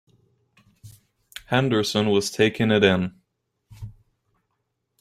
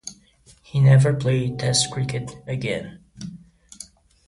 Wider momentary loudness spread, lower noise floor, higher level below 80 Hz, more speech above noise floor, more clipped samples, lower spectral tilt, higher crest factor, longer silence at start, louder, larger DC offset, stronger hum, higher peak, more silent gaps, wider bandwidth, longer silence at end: about the same, 24 LU vs 25 LU; first, -76 dBFS vs -54 dBFS; about the same, -56 dBFS vs -52 dBFS; first, 56 dB vs 34 dB; neither; about the same, -5 dB/octave vs -5 dB/octave; about the same, 22 dB vs 18 dB; first, 0.85 s vs 0.05 s; about the same, -21 LUFS vs -21 LUFS; neither; neither; about the same, -4 dBFS vs -6 dBFS; neither; first, 15.5 kHz vs 11.5 kHz; first, 1.1 s vs 0.45 s